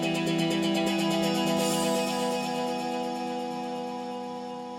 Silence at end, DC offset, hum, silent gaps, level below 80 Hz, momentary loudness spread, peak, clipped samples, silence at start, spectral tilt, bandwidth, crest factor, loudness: 0 s; under 0.1%; none; none; -66 dBFS; 9 LU; -14 dBFS; under 0.1%; 0 s; -4.5 dB/octave; 16.5 kHz; 14 dB; -28 LUFS